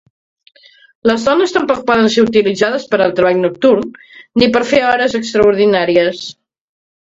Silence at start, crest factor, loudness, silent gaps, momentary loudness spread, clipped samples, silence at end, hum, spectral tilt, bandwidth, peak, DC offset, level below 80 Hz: 1.05 s; 14 dB; -13 LUFS; none; 7 LU; under 0.1%; 0.8 s; none; -5 dB/octave; 7.8 kHz; 0 dBFS; under 0.1%; -48 dBFS